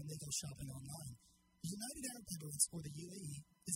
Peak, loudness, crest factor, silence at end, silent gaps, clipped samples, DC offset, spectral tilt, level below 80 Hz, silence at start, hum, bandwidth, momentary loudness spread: -20 dBFS; -44 LUFS; 28 dB; 0 s; none; under 0.1%; under 0.1%; -3 dB/octave; -68 dBFS; 0 s; none; 16 kHz; 14 LU